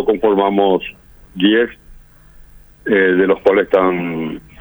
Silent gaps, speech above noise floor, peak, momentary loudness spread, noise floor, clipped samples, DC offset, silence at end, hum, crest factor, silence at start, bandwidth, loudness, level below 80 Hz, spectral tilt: none; 28 dB; 0 dBFS; 13 LU; -43 dBFS; under 0.1%; under 0.1%; 0.2 s; none; 16 dB; 0 s; over 20 kHz; -15 LUFS; -46 dBFS; -7.5 dB/octave